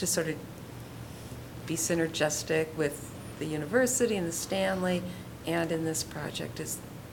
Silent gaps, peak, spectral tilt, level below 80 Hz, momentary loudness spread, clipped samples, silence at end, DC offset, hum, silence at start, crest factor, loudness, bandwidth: none; -14 dBFS; -4 dB/octave; -56 dBFS; 15 LU; under 0.1%; 0 s; under 0.1%; none; 0 s; 18 dB; -31 LUFS; 18 kHz